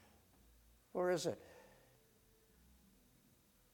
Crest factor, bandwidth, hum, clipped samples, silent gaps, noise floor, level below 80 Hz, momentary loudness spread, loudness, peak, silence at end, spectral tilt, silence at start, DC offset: 20 dB; 19 kHz; none; under 0.1%; none; -72 dBFS; -74 dBFS; 25 LU; -41 LUFS; -26 dBFS; 2.1 s; -4.5 dB/octave; 0.95 s; under 0.1%